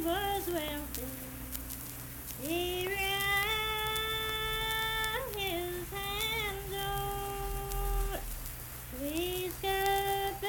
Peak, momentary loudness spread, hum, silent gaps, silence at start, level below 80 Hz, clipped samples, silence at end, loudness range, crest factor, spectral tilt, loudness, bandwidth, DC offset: -12 dBFS; 10 LU; none; none; 0 s; -44 dBFS; under 0.1%; 0 s; 4 LU; 22 dB; -3 dB/octave; -34 LUFS; 19 kHz; under 0.1%